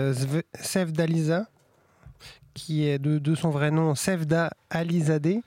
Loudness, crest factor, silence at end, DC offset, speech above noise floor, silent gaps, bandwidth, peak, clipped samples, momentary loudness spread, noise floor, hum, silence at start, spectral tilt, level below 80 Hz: -26 LUFS; 14 dB; 0.05 s; under 0.1%; 36 dB; none; 16 kHz; -12 dBFS; under 0.1%; 6 LU; -61 dBFS; none; 0 s; -6 dB/octave; -62 dBFS